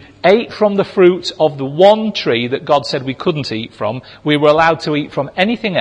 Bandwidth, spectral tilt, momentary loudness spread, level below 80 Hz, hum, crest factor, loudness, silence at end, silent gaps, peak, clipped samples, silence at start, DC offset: 10 kHz; -6 dB/octave; 10 LU; -52 dBFS; none; 14 dB; -14 LUFS; 0 s; none; 0 dBFS; under 0.1%; 0.25 s; under 0.1%